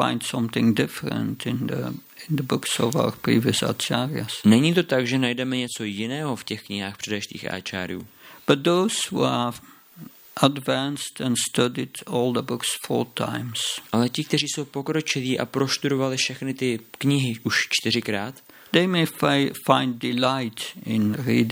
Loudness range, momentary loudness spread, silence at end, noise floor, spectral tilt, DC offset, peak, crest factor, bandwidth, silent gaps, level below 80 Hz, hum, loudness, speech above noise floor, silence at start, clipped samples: 3 LU; 9 LU; 0 s; -45 dBFS; -4.5 dB/octave; under 0.1%; -2 dBFS; 22 dB; 17 kHz; none; -66 dBFS; none; -24 LUFS; 21 dB; 0 s; under 0.1%